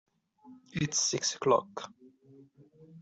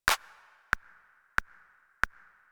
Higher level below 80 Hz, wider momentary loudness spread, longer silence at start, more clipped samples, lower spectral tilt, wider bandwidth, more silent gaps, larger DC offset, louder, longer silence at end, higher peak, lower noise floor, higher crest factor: second, -68 dBFS vs -52 dBFS; first, 17 LU vs 3 LU; first, 0.45 s vs 0.05 s; neither; first, -3 dB/octave vs -0.5 dB/octave; second, 8.2 kHz vs over 20 kHz; neither; neither; first, -30 LUFS vs -33 LUFS; second, 0 s vs 0.45 s; second, -12 dBFS vs -4 dBFS; second, -58 dBFS vs -62 dBFS; second, 22 dB vs 30 dB